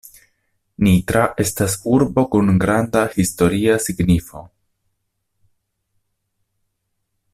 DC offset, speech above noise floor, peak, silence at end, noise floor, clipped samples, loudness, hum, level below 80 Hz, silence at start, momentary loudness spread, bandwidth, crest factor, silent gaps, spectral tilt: under 0.1%; 56 dB; -2 dBFS; 2.9 s; -73 dBFS; under 0.1%; -17 LUFS; none; -42 dBFS; 0.8 s; 4 LU; 15.5 kHz; 16 dB; none; -6 dB/octave